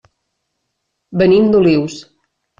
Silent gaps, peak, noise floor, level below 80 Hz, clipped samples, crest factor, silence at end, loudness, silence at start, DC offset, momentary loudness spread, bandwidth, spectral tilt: none; -2 dBFS; -72 dBFS; -50 dBFS; under 0.1%; 14 dB; 0.6 s; -12 LUFS; 1.1 s; under 0.1%; 15 LU; 7.6 kHz; -7 dB/octave